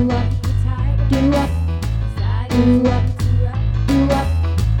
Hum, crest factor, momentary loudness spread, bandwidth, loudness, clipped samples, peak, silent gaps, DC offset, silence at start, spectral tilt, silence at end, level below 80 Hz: none; 12 dB; 6 LU; 16.5 kHz; -18 LUFS; under 0.1%; -4 dBFS; none; under 0.1%; 0 s; -8 dB/octave; 0 s; -22 dBFS